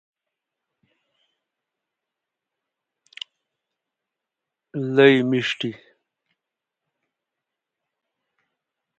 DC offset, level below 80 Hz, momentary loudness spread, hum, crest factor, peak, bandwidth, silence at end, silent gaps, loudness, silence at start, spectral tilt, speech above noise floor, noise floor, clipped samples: under 0.1%; -76 dBFS; 22 LU; none; 26 dB; -2 dBFS; 8 kHz; 3.25 s; none; -19 LUFS; 4.75 s; -6 dB/octave; 67 dB; -85 dBFS; under 0.1%